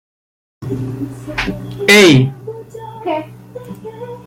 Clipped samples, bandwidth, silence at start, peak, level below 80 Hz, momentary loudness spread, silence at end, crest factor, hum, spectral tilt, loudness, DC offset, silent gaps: under 0.1%; 16.5 kHz; 0.6 s; 0 dBFS; -42 dBFS; 25 LU; 0.05 s; 16 dB; none; -4.5 dB/octave; -13 LUFS; under 0.1%; none